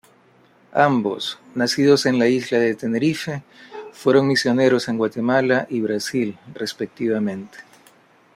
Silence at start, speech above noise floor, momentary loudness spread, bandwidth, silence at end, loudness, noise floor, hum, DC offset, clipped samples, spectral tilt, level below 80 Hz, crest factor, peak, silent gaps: 0.75 s; 35 dB; 13 LU; 15.5 kHz; 0.75 s; -20 LUFS; -55 dBFS; none; under 0.1%; under 0.1%; -5 dB/octave; -64 dBFS; 18 dB; -2 dBFS; none